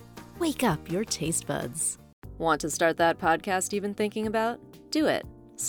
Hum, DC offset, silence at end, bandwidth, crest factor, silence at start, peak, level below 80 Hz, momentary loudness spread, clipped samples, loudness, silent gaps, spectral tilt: none; under 0.1%; 0 s; over 20 kHz; 18 dB; 0 s; -10 dBFS; -54 dBFS; 8 LU; under 0.1%; -28 LUFS; 2.13-2.22 s; -3.5 dB/octave